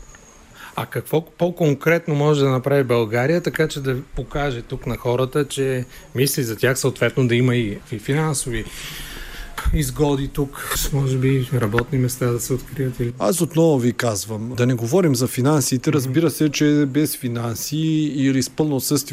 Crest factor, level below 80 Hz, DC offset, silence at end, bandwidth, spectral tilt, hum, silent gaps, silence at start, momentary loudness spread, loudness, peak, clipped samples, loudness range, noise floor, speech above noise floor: 16 dB; -38 dBFS; under 0.1%; 0 s; 16 kHz; -5.5 dB/octave; none; none; 0 s; 10 LU; -20 LUFS; -4 dBFS; under 0.1%; 4 LU; -45 dBFS; 25 dB